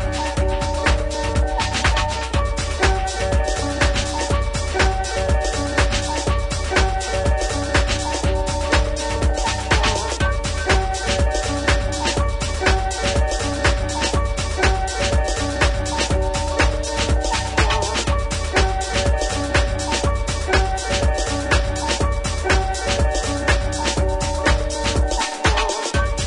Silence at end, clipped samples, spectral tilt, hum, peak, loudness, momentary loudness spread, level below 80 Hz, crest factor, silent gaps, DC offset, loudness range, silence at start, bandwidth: 0 s; under 0.1%; -4 dB/octave; none; -2 dBFS; -20 LUFS; 3 LU; -24 dBFS; 16 dB; none; under 0.1%; 1 LU; 0 s; 11 kHz